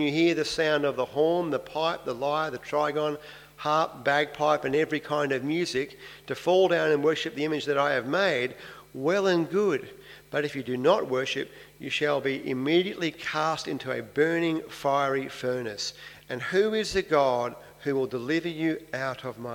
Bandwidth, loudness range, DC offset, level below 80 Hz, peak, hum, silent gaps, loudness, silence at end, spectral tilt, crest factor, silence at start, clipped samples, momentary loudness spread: 18 kHz; 2 LU; under 0.1%; -62 dBFS; -8 dBFS; 50 Hz at -60 dBFS; none; -27 LUFS; 0 s; -5 dB/octave; 20 dB; 0 s; under 0.1%; 10 LU